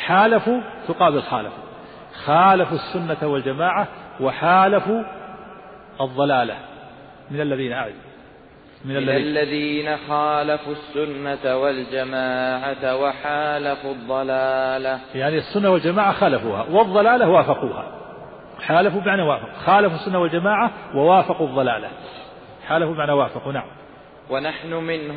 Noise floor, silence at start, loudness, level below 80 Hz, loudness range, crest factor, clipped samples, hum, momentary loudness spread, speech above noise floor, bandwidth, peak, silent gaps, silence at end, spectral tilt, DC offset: -46 dBFS; 0 s; -20 LUFS; -56 dBFS; 6 LU; 16 dB; under 0.1%; none; 19 LU; 26 dB; 5 kHz; -4 dBFS; none; 0 s; -10.5 dB/octave; under 0.1%